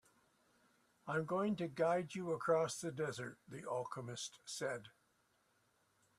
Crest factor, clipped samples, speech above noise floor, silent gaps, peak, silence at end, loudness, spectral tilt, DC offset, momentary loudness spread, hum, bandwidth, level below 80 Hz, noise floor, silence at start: 20 dB; under 0.1%; 38 dB; none; -24 dBFS; 1.3 s; -41 LUFS; -5 dB/octave; under 0.1%; 12 LU; none; 14 kHz; -82 dBFS; -78 dBFS; 1.05 s